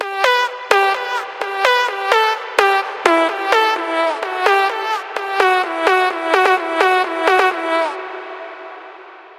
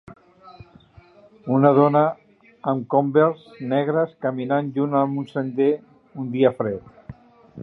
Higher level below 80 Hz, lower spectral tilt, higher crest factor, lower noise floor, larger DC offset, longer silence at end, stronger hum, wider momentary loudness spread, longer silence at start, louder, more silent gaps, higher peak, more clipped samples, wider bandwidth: second, -70 dBFS vs -60 dBFS; second, -1 dB/octave vs -10.5 dB/octave; about the same, 16 dB vs 20 dB; second, -38 dBFS vs -50 dBFS; neither; about the same, 0.05 s vs 0 s; neither; second, 10 LU vs 15 LU; about the same, 0 s vs 0.1 s; first, -16 LUFS vs -21 LUFS; neither; about the same, 0 dBFS vs -2 dBFS; neither; first, 16 kHz vs 4.4 kHz